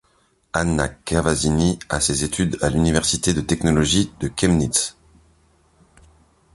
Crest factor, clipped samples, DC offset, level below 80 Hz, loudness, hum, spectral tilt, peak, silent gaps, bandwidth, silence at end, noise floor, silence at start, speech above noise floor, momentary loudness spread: 20 dB; under 0.1%; under 0.1%; -36 dBFS; -20 LUFS; none; -4 dB/octave; -2 dBFS; none; 11.5 kHz; 1.65 s; -62 dBFS; 0.55 s; 42 dB; 5 LU